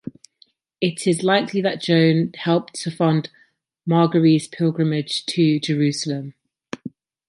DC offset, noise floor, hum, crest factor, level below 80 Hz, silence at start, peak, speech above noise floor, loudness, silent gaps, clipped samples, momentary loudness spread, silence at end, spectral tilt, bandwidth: under 0.1%; -58 dBFS; none; 18 dB; -68 dBFS; 0.05 s; -4 dBFS; 39 dB; -20 LUFS; none; under 0.1%; 18 LU; 0.4 s; -6 dB/octave; 11.5 kHz